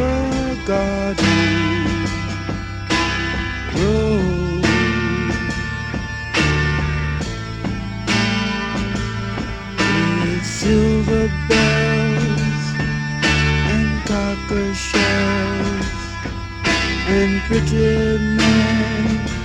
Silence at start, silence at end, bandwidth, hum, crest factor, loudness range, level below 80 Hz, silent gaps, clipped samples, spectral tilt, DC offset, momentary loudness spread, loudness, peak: 0 s; 0 s; 11 kHz; none; 16 dB; 3 LU; -28 dBFS; none; under 0.1%; -5.5 dB/octave; under 0.1%; 9 LU; -19 LUFS; -2 dBFS